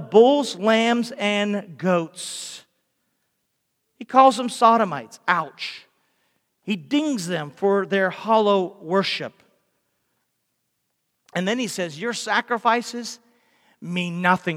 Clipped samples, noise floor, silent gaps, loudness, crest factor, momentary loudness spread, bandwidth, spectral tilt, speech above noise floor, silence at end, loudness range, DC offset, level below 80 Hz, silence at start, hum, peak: under 0.1%; -75 dBFS; none; -21 LUFS; 22 dB; 15 LU; 16 kHz; -4.5 dB/octave; 54 dB; 0 s; 6 LU; under 0.1%; -78 dBFS; 0 s; none; -2 dBFS